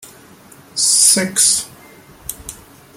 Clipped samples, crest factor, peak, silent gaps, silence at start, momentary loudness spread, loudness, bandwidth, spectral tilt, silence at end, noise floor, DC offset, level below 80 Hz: under 0.1%; 18 dB; 0 dBFS; none; 0.05 s; 23 LU; -11 LUFS; 17 kHz; -0.5 dB/octave; 0.45 s; -43 dBFS; under 0.1%; -52 dBFS